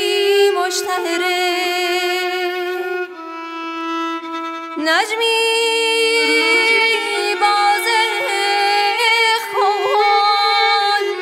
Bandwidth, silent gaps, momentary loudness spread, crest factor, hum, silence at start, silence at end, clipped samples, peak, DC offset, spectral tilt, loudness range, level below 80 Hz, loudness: 16 kHz; none; 11 LU; 14 dB; none; 0 s; 0 s; under 0.1%; -2 dBFS; under 0.1%; 0.5 dB/octave; 6 LU; -82 dBFS; -15 LUFS